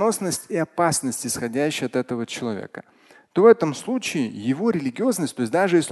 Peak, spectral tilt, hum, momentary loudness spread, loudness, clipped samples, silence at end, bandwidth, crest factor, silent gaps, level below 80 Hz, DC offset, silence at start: -2 dBFS; -4.5 dB/octave; none; 11 LU; -22 LUFS; under 0.1%; 0 s; 12.5 kHz; 20 dB; none; -62 dBFS; under 0.1%; 0 s